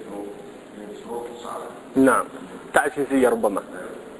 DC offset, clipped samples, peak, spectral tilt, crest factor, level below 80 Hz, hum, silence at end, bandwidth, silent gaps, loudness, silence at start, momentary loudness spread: under 0.1%; under 0.1%; 0 dBFS; -4.5 dB/octave; 24 dB; -58 dBFS; none; 0 s; 11 kHz; none; -23 LUFS; 0 s; 20 LU